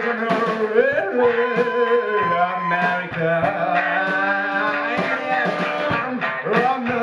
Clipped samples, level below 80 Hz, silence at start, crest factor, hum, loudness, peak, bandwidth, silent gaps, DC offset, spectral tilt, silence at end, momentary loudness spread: under 0.1%; -60 dBFS; 0 s; 14 dB; none; -20 LUFS; -6 dBFS; 11 kHz; none; under 0.1%; -6.5 dB/octave; 0 s; 3 LU